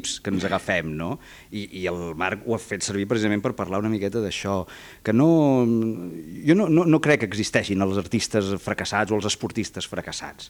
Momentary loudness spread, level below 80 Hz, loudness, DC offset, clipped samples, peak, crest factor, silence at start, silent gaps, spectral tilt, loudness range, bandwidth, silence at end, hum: 13 LU; -54 dBFS; -23 LUFS; under 0.1%; under 0.1%; -6 dBFS; 18 dB; 0 s; none; -5 dB/octave; 6 LU; 19.5 kHz; 0 s; none